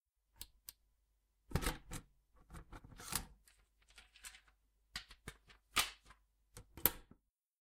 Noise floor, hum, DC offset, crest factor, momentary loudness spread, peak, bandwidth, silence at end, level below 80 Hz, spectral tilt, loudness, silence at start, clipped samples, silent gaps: -80 dBFS; none; under 0.1%; 36 dB; 25 LU; -10 dBFS; 16 kHz; 0.55 s; -56 dBFS; -2.5 dB/octave; -41 LUFS; 0.4 s; under 0.1%; none